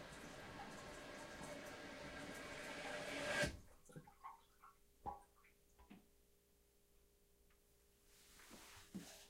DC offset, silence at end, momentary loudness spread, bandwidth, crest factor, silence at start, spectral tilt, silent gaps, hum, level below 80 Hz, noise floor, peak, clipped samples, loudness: under 0.1%; 0 s; 22 LU; 16 kHz; 26 dB; 0 s; -3.5 dB/octave; none; none; -68 dBFS; -75 dBFS; -28 dBFS; under 0.1%; -50 LUFS